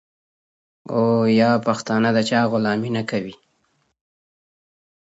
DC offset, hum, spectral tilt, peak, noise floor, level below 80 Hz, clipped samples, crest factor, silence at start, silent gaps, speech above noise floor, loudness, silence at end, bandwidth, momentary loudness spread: under 0.1%; none; -6 dB/octave; -4 dBFS; -67 dBFS; -64 dBFS; under 0.1%; 18 dB; 0.9 s; none; 48 dB; -20 LUFS; 1.8 s; 8 kHz; 10 LU